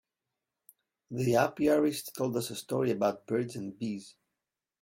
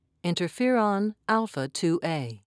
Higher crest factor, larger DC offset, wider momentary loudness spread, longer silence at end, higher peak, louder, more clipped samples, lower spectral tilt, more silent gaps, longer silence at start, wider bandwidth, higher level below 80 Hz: about the same, 20 dB vs 18 dB; neither; first, 11 LU vs 7 LU; first, 0.7 s vs 0.15 s; about the same, -12 dBFS vs -10 dBFS; second, -31 LUFS vs -27 LUFS; neither; about the same, -5.5 dB/octave vs -5.5 dB/octave; neither; first, 1.1 s vs 0.25 s; first, 16.5 kHz vs 11 kHz; first, -68 dBFS vs -74 dBFS